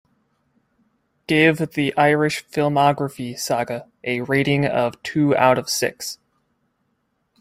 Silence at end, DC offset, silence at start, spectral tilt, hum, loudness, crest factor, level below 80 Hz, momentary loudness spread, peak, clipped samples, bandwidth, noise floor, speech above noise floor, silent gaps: 1.25 s; under 0.1%; 1.3 s; -5 dB/octave; none; -20 LUFS; 18 dB; -60 dBFS; 12 LU; -2 dBFS; under 0.1%; 16 kHz; -70 dBFS; 51 dB; none